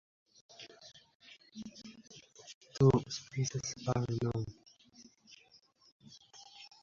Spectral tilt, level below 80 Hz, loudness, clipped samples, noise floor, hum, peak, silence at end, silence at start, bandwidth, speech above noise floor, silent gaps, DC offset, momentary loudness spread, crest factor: -7 dB/octave; -62 dBFS; -34 LUFS; under 0.1%; -66 dBFS; none; -16 dBFS; 0.15 s; 0.6 s; 7.6 kHz; 34 dB; 1.15-1.20 s, 2.54-2.61 s, 5.92-6.00 s; under 0.1%; 28 LU; 22 dB